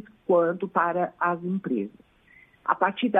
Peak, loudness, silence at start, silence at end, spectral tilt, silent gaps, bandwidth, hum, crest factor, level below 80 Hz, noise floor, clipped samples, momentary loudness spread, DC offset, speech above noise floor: -6 dBFS; -26 LUFS; 0.3 s; 0 s; -9 dB/octave; none; 3.9 kHz; none; 20 dB; -70 dBFS; -57 dBFS; under 0.1%; 8 LU; under 0.1%; 32 dB